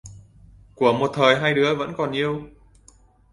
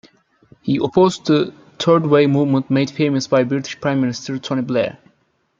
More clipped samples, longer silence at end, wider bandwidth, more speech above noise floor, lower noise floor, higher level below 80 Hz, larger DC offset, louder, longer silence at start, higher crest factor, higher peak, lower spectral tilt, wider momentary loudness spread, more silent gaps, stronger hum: neither; first, 0.85 s vs 0.7 s; first, 11.5 kHz vs 7.6 kHz; second, 34 dB vs 46 dB; second, -54 dBFS vs -62 dBFS; about the same, -54 dBFS vs -58 dBFS; neither; second, -21 LUFS vs -18 LUFS; second, 0.05 s vs 0.65 s; first, 22 dB vs 16 dB; about the same, -2 dBFS vs -2 dBFS; about the same, -5.5 dB/octave vs -6.5 dB/octave; about the same, 8 LU vs 9 LU; neither; neither